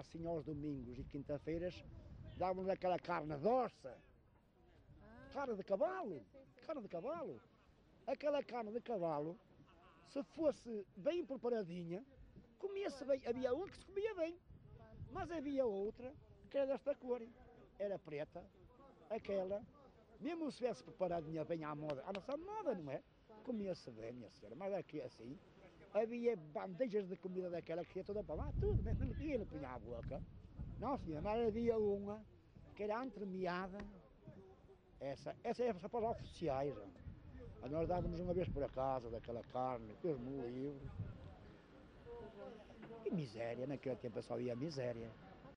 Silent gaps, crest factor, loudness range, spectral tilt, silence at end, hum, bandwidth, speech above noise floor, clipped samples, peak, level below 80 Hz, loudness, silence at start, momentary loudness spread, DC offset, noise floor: none; 18 dB; 5 LU; -8 dB/octave; 0 s; none; 10 kHz; 27 dB; under 0.1%; -26 dBFS; -58 dBFS; -44 LUFS; 0 s; 17 LU; under 0.1%; -70 dBFS